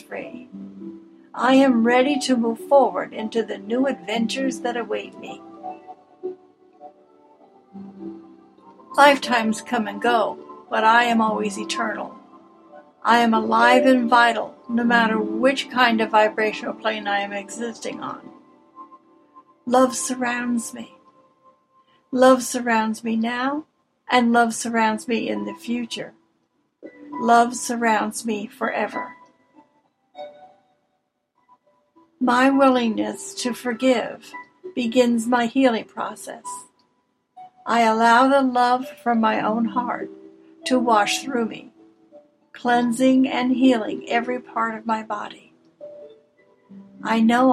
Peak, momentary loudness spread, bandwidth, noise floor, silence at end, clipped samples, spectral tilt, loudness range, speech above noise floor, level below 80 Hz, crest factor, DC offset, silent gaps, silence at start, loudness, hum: 0 dBFS; 21 LU; 14.5 kHz; -72 dBFS; 0 s; under 0.1%; -4 dB/octave; 9 LU; 52 dB; -72 dBFS; 22 dB; under 0.1%; none; 0.1 s; -20 LUFS; none